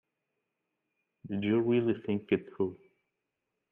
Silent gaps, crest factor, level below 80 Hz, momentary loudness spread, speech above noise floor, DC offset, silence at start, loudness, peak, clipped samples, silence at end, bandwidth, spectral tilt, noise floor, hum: none; 20 dB; -74 dBFS; 8 LU; 55 dB; under 0.1%; 1.25 s; -31 LUFS; -14 dBFS; under 0.1%; 1 s; 3.7 kHz; -10 dB/octave; -85 dBFS; none